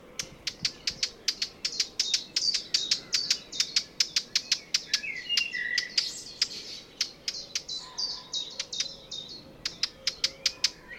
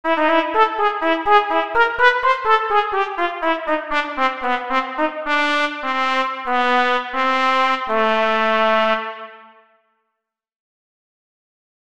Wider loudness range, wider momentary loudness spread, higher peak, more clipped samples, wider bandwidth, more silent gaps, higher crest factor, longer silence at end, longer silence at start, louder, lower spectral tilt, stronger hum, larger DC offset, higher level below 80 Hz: about the same, 6 LU vs 4 LU; first, 9 LU vs 6 LU; second, -8 dBFS vs 0 dBFS; neither; first, 18 kHz vs 10.5 kHz; neither; about the same, 24 dB vs 20 dB; second, 0 s vs 1.45 s; about the same, 0 s vs 0.05 s; second, -29 LUFS vs -18 LUFS; second, 1.5 dB/octave vs -3.5 dB/octave; neither; second, under 0.1% vs 1%; second, -62 dBFS vs -52 dBFS